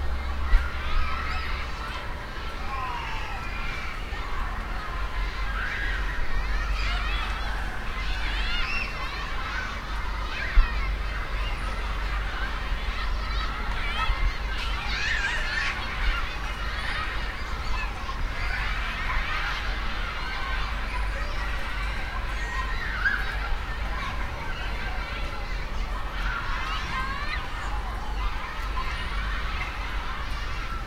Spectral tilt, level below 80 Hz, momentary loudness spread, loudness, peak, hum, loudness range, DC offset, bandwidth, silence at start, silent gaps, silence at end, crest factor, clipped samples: -4 dB/octave; -30 dBFS; 6 LU; -30 LUFS; -6 dBFS; none; 4 LU; under 0.1%; 13.5 kHz; 0 s; none; 0 s; 20 dB; under 0.1%